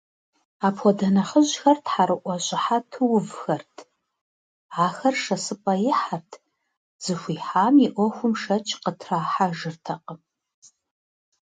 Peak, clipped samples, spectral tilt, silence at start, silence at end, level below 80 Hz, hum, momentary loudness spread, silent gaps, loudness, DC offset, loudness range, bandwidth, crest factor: -6 dBFS; under 0.1%; -5 dB/octave; 0.6 s; 1.25 s; -72 dBFS; none; 12 LU; 4.21-4.69 s, 6.77-6.99 s; -23 LUFS; under 0.1%; 5 LU; 9.4 kHz; 18 dB